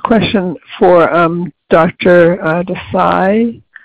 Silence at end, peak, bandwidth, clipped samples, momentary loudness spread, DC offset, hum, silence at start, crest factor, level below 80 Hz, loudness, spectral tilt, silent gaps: 0.3 s; 0 dBFS; 5 kHz; under 0.1%; 9 LU; 0.6%; none; 0.05 s; 12 dB; -42 dBFS; -11 LUFS; -8.5 dB/octave; none